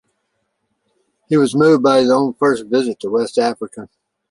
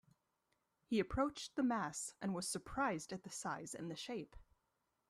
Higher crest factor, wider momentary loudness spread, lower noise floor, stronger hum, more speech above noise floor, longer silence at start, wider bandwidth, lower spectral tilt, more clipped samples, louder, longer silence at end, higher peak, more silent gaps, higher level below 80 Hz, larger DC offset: about the same, 16 dB vs 18 dB; about the same, 11 LU vs 9 LU; second, -70 dBFS vs -85 dBFS; neither; first, 55 dB vs 44 dB; first, 1.3 s vs 0.9 s; second, 11.5 kHz vs 14 kHz; first, -6 dB/octave vs -4 dB/octave; neither; first, -15 LUFS vs -42 LUFS; second, 0.45 s vs 0.7 s; first, -2 dBFS vs -24 dBFS; neither; about the same, -62 dBFS vs -64 dBFS; neither